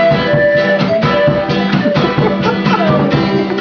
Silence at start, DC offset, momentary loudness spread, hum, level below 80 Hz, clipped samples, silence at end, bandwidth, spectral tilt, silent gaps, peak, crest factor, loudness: 0 s; under 0.1%; 3 LU; none; -38 dBFS; under 0.1%; 0 s; 5.4 kHz; -7.5 dB/octave; none; 0 dBFS; 12 dB; -12 LUFS